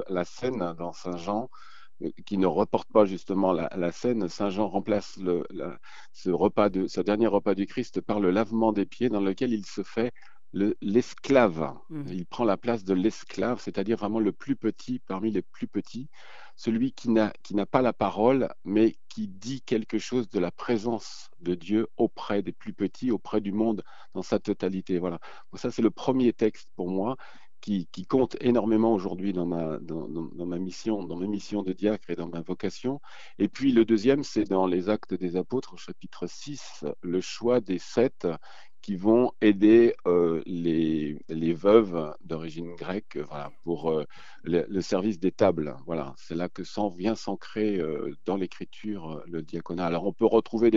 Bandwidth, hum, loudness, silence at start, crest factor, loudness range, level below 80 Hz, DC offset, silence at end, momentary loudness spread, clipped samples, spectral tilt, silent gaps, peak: 7.8 kHz; none; -28 LUFS; 0 s; 22 dB; 7 LU; -60 dBFS; 0.9%; 0 s; 13 LU; under 0.1%; -7 dB/octave; none; -4 dBFS